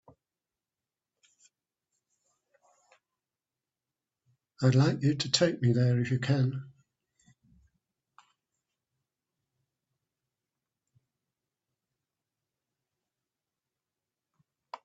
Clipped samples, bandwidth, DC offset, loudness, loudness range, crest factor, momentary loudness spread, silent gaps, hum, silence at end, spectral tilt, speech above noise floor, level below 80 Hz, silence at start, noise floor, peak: under 0.1%; 8 kHz; under 0.1%; -27 LUFS; 8 LU; 26 dB; 7 LU; none; none; 0.1 s; -6 dB/octave; over 64 dB; -70 dBFS; 4.6 s; under -90 dBFS; -8 dBFS